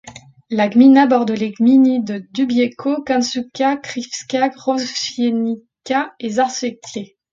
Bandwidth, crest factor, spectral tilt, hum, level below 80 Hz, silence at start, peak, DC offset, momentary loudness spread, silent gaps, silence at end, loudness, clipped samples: 7.6 kHz; 16 dB; -4.5 dB/octave; none; -62 dBFS; 0.05 s; 0 dBFS; under 0.1%; 13 LU; none; 0.25 s; -17 LUFS; under 0.1%